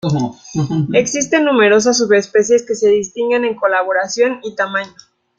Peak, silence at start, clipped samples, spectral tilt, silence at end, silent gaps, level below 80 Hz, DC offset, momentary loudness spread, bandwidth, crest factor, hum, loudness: -2 dBFS; 0.05 s; under 0.1%; -4.5 dB/octave; 0.5 s; none; -56 dBFS; under 0.1%; 9 LU; 9 kHz; 14 dB; none; -15 LUFS